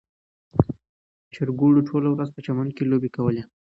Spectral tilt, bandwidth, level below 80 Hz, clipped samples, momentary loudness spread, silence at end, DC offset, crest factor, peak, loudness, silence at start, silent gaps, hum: -10.5 dB/octave; 5.8 kHz; -48 dBFS; under 0.1%; 10 LU; 0.3 s; under 0.1%; 22 dB; 0 dBFS; -23 LUFS; 0.55 s; 0.89-1.31 s; none